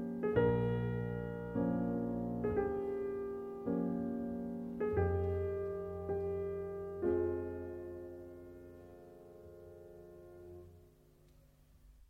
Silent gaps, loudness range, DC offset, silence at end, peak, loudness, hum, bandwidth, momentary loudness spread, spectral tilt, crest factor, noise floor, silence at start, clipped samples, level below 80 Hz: none; 18 LU; under 0.1%; 0.05 s; -20 dBFS; -38 LUFS; none; 4.4 kHz; 21 LU; -10 dB/octave; 20 dB; -64 dBFS; 0 s; under 0.1%; -56 dBFS